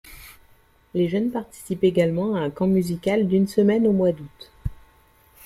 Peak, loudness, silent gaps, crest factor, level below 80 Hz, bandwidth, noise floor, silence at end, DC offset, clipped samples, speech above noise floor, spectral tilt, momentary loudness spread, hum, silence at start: -6 dBFS; -22 LUFS; none; 16 dB; -46 dBFS; 14.5 kHz; -56 dBFS; 0.7 s; under 0.1%; under 0.1%; 35 dB; -7.5 dB/octave; 16 LU; none; 0.05 s